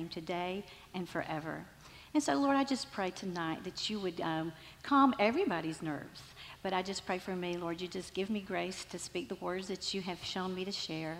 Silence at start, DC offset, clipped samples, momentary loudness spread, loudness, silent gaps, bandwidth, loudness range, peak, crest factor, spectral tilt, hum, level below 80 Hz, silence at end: 0 s; under 0.1%; under 0.1%; 13 LU; -36 LUFS; none; 16 kHz; 5 LU; -14 dBFS; 22 dB; -4.5 dB/octave; none; -66 dBFS; 0 s